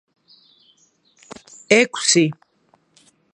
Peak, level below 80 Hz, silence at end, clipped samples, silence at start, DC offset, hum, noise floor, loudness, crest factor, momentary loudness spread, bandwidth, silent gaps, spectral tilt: 0 dBFS; -70 dBFS; 1 s; under 0.1%; 1.7 s; under 0.1%; none; -61 dBFS; -16 LUFS; 22 dB; 25 LU; 10.5 kHz; none; -3 dB/octave